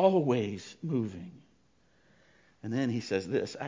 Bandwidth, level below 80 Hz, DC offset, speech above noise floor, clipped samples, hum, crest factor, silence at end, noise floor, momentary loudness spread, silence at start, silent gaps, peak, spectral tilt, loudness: 7.6 kHz; -66 dBFS; under 0.1%; 38 dB; under 0.1%; none; 20 dB; 0 s; -68 dBFS; 16 LU; 0 s; none; -12 dBFS; -7 dB/octave; -32 LUFS